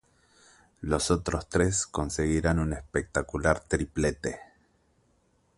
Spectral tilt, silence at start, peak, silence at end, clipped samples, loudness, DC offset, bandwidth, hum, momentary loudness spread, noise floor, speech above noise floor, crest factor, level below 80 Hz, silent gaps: -5 dB/octave; 0.8 s; -8 dBFS; 1.15 s; under 0.1%; -28 LUFS; under 0.1%; 11.5 kHz; none; 7 LU; -68 dBFS; 40 dB; 22 dB; -40 dBFS; none